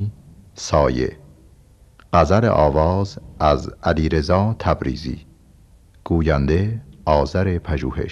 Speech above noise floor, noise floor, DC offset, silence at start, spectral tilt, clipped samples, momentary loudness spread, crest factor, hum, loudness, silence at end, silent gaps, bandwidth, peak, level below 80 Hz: 31 dB; -50 dBFS; under 0.1%; 0 s; -7 dB/octave; under 0.1%; 12 LU; 18 dB; none; -19 LUFS; 0 s; none; 9.8 kHz; -2 dBFS; -30 dBFS